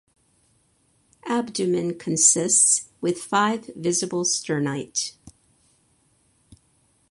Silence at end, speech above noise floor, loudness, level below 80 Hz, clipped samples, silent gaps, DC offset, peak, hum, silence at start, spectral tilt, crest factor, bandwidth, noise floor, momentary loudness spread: 1.8 s; 42 dB; -21 LUFS; -66 dBFS; under 0.1%; none; under 0.1%; -4 dBFS; none; 1.25 s; -2.5 dB/octave; 22 dB; 11.5 kHz; -65 dBFS; 12 LU